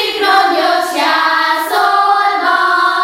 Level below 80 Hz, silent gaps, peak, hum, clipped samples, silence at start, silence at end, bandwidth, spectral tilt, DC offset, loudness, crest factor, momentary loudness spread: -60 dBFS; none; 0 dBFS; none; under 0.1%; 0 s; 0 s; 16.5 kHz; -0.5 dB/octave; under 0.1%; -11 LUFS; 12 dB; 2 LU